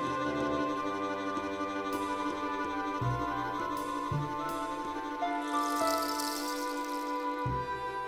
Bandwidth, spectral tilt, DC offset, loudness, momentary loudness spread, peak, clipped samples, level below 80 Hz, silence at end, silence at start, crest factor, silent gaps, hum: over 20 kHz; -5 dB/octave; under 0.1%; -34 LUFS; 4 LU; -18 dBFS; under 0.1%; -56 dBFS; 0 s; 0 s; 16 dB; none; none